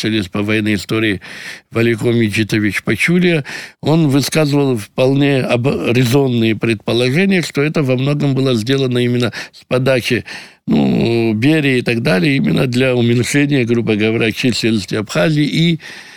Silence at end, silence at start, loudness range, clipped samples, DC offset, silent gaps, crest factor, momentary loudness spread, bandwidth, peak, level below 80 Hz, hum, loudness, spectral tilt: 0 s; 0 s; 2 LU; under 0.1%; under 0.1%; none; 12 dB; 5 LU; 19.5 kHz; -2 dBFS; -48 dBFS; none; -15 LUFS; -6 dB/octave